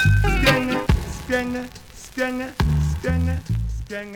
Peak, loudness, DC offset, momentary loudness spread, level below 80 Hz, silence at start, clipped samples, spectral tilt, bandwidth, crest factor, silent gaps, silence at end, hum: -4 dBFS; -22 LUFS; under 0.1%; 13 LU; -28 dBFS; 0 s; under 0.1%; -6 dB/octave; 19 kHz; 18 dB; none; 0 s; none